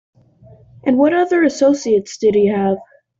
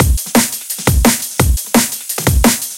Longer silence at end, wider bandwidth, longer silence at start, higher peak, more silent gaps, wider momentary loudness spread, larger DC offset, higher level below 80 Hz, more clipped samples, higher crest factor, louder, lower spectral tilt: first, 0.35 s vs 0 s; second, 7.8 kHz vs 17.5 kHz; first, 0.85 s vs 0 s; second, -4 dBFS vs 0 dBFS; neither; about the same, 6 LU vs 5 LU; second, under 0.1% vs 0.2%; second, -56 dBFS vs -20 dBFS; neither; about the same, 14 dB vs 14 dB; about the same, -16 LUFS vs -14 LUFS; first, -6 dB/octave vs -4 dB/octave